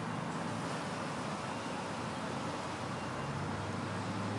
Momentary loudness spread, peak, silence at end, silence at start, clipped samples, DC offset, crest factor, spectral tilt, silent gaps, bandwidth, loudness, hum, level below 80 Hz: 1 LU; -26 dBFS; 0 s; 0 s; under 0.1%; under 0.1%; 12 dB; -5 dB/octave; none; 11.5 kHz; -39 LUFS; none; -66 dBFS